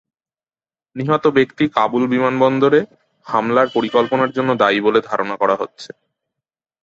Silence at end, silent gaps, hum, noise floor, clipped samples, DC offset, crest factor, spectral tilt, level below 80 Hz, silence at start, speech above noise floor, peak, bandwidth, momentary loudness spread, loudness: 0.95 s; none; none; under -90 dBFS; under 0.1%; under 0.1%; 18 dB; -6.5 dB/octave; -60 dBFS; 0.95 s; over 74 dB; 0 dBFS; 7.8 kHz; 11 LU; -17 LUFS